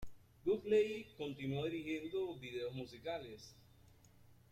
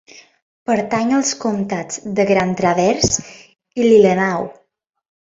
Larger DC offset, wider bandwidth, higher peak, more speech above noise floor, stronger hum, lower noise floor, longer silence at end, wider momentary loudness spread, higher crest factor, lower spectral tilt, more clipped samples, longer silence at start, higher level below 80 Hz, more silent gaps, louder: neither; first, 14 kHz vs 8 kHz; second, -22 dBFS vs 0 dBFS; second, 25 dB vs 49 dB; neither; about the same, -66 dBFS vs -65 dBFS; second, 0.15 s vs 0.7 s; first, 16 LU vs 13 LU; about the same, 18 dB vs 16 dB; first, -6.5 dB/octave vs -4.5 dB/octave; neither; second, 0 s vs 0.7 s; second, -68 dBFS vs -48 dBFS; neither; second, -41 LUFS vs -17 LUFS